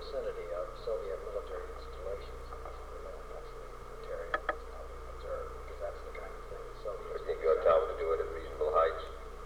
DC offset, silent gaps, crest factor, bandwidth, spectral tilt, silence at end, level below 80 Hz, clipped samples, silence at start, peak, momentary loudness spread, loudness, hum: 0.2%; none; 20 dB; 16.5 kHz; -5.5 dB/octave; 0 s; -48 dBFS; under 0.1%; 0 s; -16 dBFS; 17 LU; -36 LUFS; 60 Hz at -55 dBFS